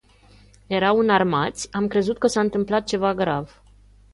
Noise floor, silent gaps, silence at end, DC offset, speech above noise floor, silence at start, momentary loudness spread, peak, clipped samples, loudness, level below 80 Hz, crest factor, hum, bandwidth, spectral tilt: -52 dBFS; none; 0.65 s; under 0.1%; 31 dB; 0.7 s; 8 LU; -6 dBFS; under 0.1%; -22 LUFS; -52 dBFS; 18 dB; 50 Hz at -45 dBFS; 11.5 kHz; -5 dB/octave